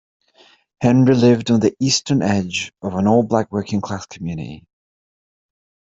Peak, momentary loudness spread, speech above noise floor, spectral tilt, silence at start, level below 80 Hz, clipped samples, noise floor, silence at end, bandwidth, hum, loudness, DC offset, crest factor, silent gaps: -4 dBFS; 14 LU; 36 dB; -5.5 dB/octave; 0.8 s; -54 dBFS; under 0.1%; -53 dBFS; 1.3 s; 7.8 kHz; none; -18 LUFS; under 0.1%; 16 dB; none